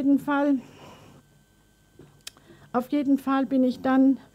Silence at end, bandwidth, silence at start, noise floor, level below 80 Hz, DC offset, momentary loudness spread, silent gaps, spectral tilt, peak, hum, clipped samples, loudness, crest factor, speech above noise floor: 0.15 s; 14.5 kHz; 0 s; -61 dBFS; -66 dBFS; under 0.1%; 23 LU; none; -6 dB/octave; -12 dBFS; none; under 0.1%; -24 LUFS; 14 dB; 38 dB